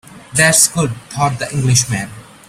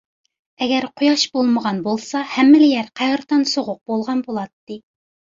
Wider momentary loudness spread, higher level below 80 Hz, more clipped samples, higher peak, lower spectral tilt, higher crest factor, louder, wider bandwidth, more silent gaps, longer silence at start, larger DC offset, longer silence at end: second, 11 LU vs 15 LU; first, -44 dBFS vs -64 dBFS; neither; about the same, 0 dBFS vs -2 dBFS; about the same, -3 dB/octave vs -4 dB/octave; about the same, 16 dB vs 16 dB; first, -14 LUFS vs -18 LUFS; first, 16 kHz vs 7.6 kHz; second, none vs 4.53-4.67 s; second, 0.1 s vs 0.6 s; neither; second, 0.25 s vs 0.6 s